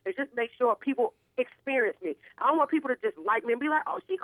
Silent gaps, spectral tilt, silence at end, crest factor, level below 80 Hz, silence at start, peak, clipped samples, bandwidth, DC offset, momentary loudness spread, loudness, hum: none; -5.5 dB/octave; 0 s; 16 dB; -80 dBFS; 0.05 s; -12 dBFS; under 0.1%; 11.5 kHz; under 0.1%; 7 LU; -29 LUFS; none